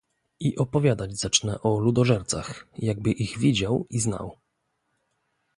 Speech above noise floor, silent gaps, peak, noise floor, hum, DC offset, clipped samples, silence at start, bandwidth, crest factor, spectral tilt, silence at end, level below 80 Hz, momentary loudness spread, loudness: 51 dB; none; -4 dBFS; -76 dBFS; none; under 0.1%; under 0.1%; 0.4 s; 11.5 kHz; 22 dB; -5 dB/octave; 1.25 s; -50 dBFS; 8 LU; -25 LUFS